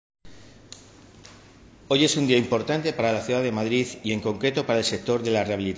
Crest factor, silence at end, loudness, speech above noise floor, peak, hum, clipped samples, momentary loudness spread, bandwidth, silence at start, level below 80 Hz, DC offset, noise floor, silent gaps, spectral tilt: 18 dB; 0 s; -24 LUFS; 26 dB; -8 dBFS; none; under 0.1%; 7 LU; 8 kHz; 0.25 s; -56 dBFS; under 0.1%; -50 dBFS; none; -4.5 dB/octave